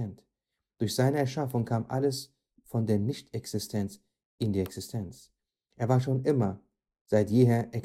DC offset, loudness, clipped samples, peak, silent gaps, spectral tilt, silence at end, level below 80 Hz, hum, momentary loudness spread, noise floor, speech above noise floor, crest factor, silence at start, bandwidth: under 0.1%; -29 LUFS; under 0.1%; -10 dBFS; 4.25-4.38 s, 7.01-7.05 s; -7 dB/octave; 0 s; -64 dBFS; none; 13 LU; -86 dBFS; 58 dB; 20 dB; 0 s; 15.5 kHz